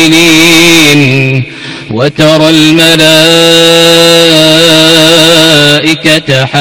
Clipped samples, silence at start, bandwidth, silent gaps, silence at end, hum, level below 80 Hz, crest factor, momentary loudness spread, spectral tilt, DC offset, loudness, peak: 10%; 0 s; over 20 kHz; none; 0 s; none; -38 dBFS; 4 dB; 8 LU; -3.5 dB/octave; under 0.1%; -3 LUFS; 0 dBFS